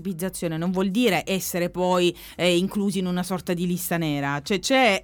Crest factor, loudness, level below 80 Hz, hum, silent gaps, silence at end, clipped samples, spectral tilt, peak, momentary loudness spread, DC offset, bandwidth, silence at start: 16 dB; -24 LUFS; -52 dBFS; none; none; 0 s; under 0.1%; -4.5 dB/octave; -6 dBFS; 6 LU; under 0.1%; over 20 kHz; 0 s